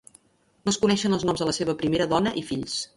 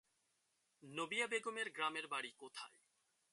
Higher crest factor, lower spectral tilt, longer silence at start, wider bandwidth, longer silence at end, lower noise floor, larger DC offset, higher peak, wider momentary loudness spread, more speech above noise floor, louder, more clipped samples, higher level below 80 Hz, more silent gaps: about the same, 18 dB vs 20 dB; first, -4.5 dB/octave vs -2 dB/octave; second, 0.65 s vs 0.8 s; about the same, 11.5 kHz vs 11.5 kHz; second, 0.1 s vs 0.65 s; second, -59 dBFS vs -83 dBFS; neither; first, -8 dBFS vs -26 dBFS; second, 7 LU vs 13 LU; about the same, 35 dB vs 38 dB; first, -25 LUFS vs -43 LUFS; neither; first, -54 dBFS vs under -90 dBFS; neither